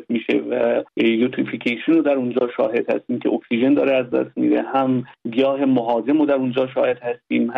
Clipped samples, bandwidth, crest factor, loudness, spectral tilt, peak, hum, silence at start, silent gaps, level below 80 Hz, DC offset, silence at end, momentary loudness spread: under 0.1%; 5 kHz; 14 dB; -20 LUFS; -8 dB/octave; -6 dBFS; none; 0 s; none; -68 dBFS; under 0.1%; 0 s; 5 LU